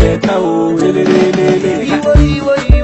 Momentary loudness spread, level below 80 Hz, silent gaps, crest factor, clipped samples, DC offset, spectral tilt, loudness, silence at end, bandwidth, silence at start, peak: 4 LU; -16 dBFS; none; 10 dB; 2%; under 0.1%; -7 dB/octave; -11 LUFS; 0 s; 8.4 kHz; 0 s; 0 dBFS